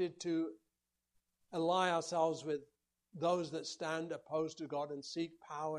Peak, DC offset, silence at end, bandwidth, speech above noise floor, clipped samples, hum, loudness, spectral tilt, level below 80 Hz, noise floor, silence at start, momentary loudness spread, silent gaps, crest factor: -20 dBFS; under 0.1%; 0 s; 11.5 kHz; 50 dB; under 0.1%; none; -39 LUFS; -4.5 dB/octave; -84 dBFS; -88 dBFS; 0 s; 10 LU; none; 20 dB